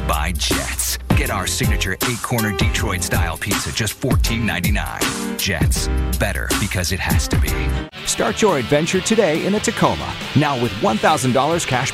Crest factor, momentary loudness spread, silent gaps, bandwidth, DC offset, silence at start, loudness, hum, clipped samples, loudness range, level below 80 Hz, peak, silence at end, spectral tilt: 16 dB; 4 LU; none; 16 kHz; under 0.1%; 0 s; -19 LUFS; none; under 0.1%; 2 LU; -26 dBFS; -2 dBFS; 0 s; -4 dB/octave